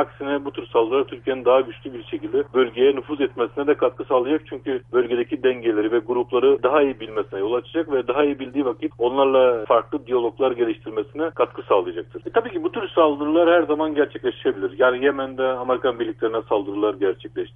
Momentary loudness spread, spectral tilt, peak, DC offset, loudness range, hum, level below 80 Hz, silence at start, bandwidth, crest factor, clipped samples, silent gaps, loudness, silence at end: 8 LU; -8.5 dB/octave; -4 dBFS; under 0.1%; 2 LU; none; -56 dBFS; 0 s; 3.8 kHz; 16 dB; under 0.1%; none; -21 LUFS; 0.05 s